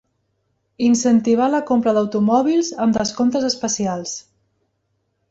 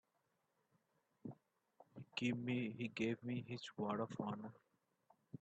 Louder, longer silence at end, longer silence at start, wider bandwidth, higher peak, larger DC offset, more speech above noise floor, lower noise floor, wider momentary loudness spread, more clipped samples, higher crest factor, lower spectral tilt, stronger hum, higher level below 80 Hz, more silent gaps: first, -18 LUFS vs -44 LUFS; first, 1.1 s vs 0.05 s; second, 0.8 s vs 1.25 s; about the same, 8 kHz vs 8.4 kHz; first, -4 dBFS vs -26 dBFS; neither; first, 53 dB vs 41 dB; second, -70 dBFS vs -85 dBFS; second, 7 LU vs 15 LU; neither; second, 14 dB vs 20 dB; second, -4.5 dB/octave vs -6.5 dB/octave; neither; first, -56 dBFS vs -84 dBFS; neither